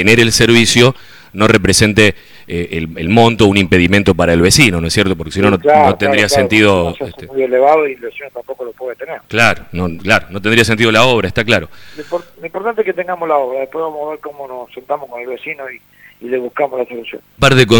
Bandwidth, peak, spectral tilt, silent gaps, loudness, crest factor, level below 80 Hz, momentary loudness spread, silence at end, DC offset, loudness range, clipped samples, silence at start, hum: over 20 kHz; 0 dBFS; -4.5 dB/octave; none; -12 LUFS; 12 dB; -36 dBFS; 18 LU; 0 s; under 0.1%; 10 LU; 0.2%; 0 s; 50 Hz at -40 dBFS